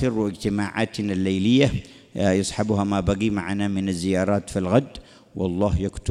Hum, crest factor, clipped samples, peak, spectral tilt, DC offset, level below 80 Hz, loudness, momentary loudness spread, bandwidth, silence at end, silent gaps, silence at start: none; 18 dB; under 0.1%; -4 dBFS; -6 dB/octave; under 0.1%; -40 dBFS; -23 LUFS; 8 LU; 12.5 kHz; 0 s; none; 0 s